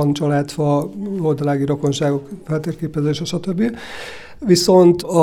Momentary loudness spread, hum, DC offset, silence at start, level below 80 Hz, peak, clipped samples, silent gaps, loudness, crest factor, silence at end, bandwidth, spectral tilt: 13 LU; none; under 0.1%; 0 s; -50 dBFS; -2 dBFS; under 0.1%; none; -18 LUFS; 16 dB; 0 s; 16 kHz; -6 dB/octave